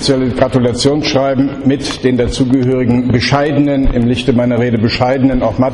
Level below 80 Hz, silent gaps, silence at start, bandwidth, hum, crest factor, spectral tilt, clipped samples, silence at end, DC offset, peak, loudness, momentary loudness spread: -26 dBFS; none; 0 s; 11 kHz; none; 12 dB; -6 dB/octave; under 0.1%; 0 s; under 0.1%; 0 dBFS; -13 LUFS; 2 LU